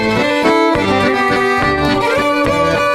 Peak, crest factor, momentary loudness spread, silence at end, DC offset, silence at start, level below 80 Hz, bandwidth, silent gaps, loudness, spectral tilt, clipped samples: -4 dBFS; 10 dB; 2 LU; 0 s; under 0.1%; 0 s; -36 dBFS; 16 kHz; none; -13 LUFS; -5 dB/octave; under 0.1%